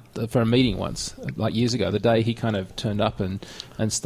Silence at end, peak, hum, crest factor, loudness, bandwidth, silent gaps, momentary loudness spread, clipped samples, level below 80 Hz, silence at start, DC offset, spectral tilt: 0 s; -8 dBFS; none; 16 dB; -24 LUFS; 15 kHz; none; 9 LU; under 0.1%; -44 dBFS; 0.15 s; under 0.1%; -5.5 dB/octave